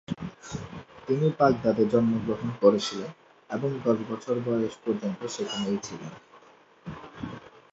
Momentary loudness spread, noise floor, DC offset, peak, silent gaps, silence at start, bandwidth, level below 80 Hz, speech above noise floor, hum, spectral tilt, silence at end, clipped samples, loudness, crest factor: 19 LU; -56 dBFS; under 0.1%; -6 dBFS; none; 0.1 s; 8 kHz; -60 dBFS; 29 dB; none; -6 dB/octave; 0.25 s; under 0.1%; -27 LUFS; 22 dB